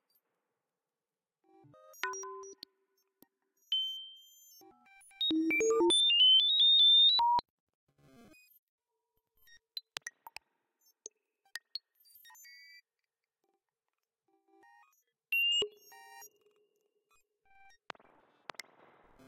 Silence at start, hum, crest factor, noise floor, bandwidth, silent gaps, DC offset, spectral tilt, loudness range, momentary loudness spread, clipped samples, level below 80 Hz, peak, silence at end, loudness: 2.05 s; none; 22 dB; under -90 dBFS; 16 kHz; 7.50-7.67 s, 7.75-7.87 s, 8.59-8.78 s; under 0.1%; 0 dB/octave; 26 LU; 27 LU; under 0.1%; -78 dBFS; -12 dBFS; 3 s; -26 LUFS